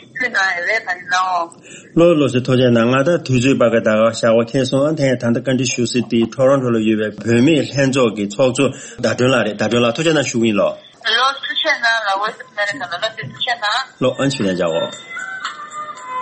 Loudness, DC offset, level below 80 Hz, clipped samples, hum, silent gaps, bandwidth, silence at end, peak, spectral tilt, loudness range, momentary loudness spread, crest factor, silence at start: -16 LUFS; under 0.1%; -54 dBFS; under 0.1%; none; none; 8.8 kHz; 0 s; -2 dBFS; -5 dB/octave; 4 LU; 9 LU; 14 dB; 0.15 s